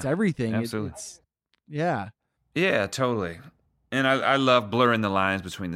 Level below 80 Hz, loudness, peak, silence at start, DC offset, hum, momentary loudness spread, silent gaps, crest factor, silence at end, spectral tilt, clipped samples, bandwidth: -60 dBFS; -25 LUFS; -8 dBFS; 0 s; under 0.1%; none; 15 LU; none; 18 dB; 0 s; -5.5 dB/octave; under 0.1%; 15.5 kHz